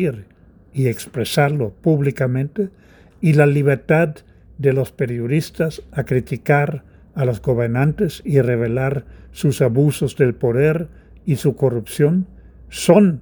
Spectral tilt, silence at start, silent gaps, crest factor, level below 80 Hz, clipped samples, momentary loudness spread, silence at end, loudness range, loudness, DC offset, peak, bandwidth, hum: -7 dB/octave; 0 s; none; 18 dB; -46 dBFS; under 0.1%; 12 LU; 0 s; 2 LU; -19 LUFS; under 0.1%; 0 dBFS; over 20 kHz; none